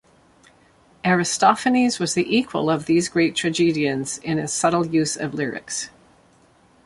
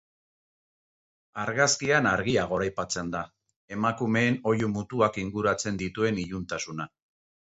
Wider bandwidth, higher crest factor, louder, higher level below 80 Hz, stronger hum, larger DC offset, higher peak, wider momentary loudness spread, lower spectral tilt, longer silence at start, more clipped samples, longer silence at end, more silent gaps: first, 11.5 kHz vs 8.2 kHz; about the same, 20 dB vs 22 dB; first, -21 LUFS vs -27 LUFS; about the same, -58 dBFS vs -56 dBFS; neither; neither; first, -2 dBFS vs -6 dBFS; second, 9 LU vs 12 LU; about the same, -4 dB/octave vs -4.5 dB/octave; second, 1.05 s vs 1.35 s; neither; first, 1 s vs 0.7 s; second, none vs 3.56-3.68 s